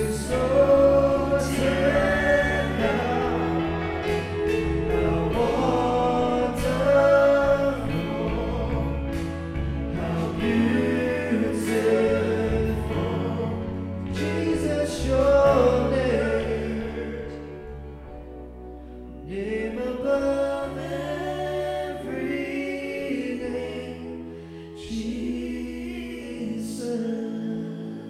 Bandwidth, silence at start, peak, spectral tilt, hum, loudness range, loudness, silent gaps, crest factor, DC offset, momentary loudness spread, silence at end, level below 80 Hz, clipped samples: 14.5 kHz; 0 s; -8 dBFS; -6.5 dB/octave; none; 10 LU; -24 LUFS; none; 18 dB; under 0.1%; 15 LU; 0 s; -38 dBFS; under 0.1%